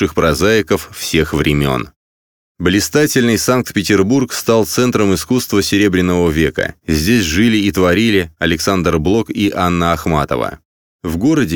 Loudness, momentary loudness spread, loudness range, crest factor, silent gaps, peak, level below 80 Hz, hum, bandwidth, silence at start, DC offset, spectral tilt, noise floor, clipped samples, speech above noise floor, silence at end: -14 LUFS; 6 LU; 2 LU; 14 dB; 1.96-2.55 s, 10.65-10.99 s; 0 dBFS; -34 dBFS; none; over 20 kHz; 0 s; under 0.1%; -5 dB/octave; under -90 dBFS; under 0.1%; over 76 dB; 0 s